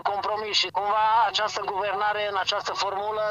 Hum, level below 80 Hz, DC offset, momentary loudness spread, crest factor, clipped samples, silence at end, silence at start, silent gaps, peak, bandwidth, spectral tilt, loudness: none; -64 dBFS; under 0.1%; 6 LU; 16 dB; under 0.1%; 0 s; 0.05 s; none; -10 dBFS; 8.8 kHz; -1 dB/octave; -25 LUFS